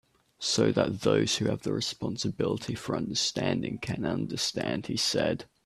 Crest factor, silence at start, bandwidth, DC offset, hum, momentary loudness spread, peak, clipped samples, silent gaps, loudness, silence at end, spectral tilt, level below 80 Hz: 20 dB; 0.4 s; 14 kHz; under 0.1%; none; 7 LU; -10 dBFS; under 0.1%; none; -29 LUFS; 0.2 s; -4 dB/octave; -58 dBFS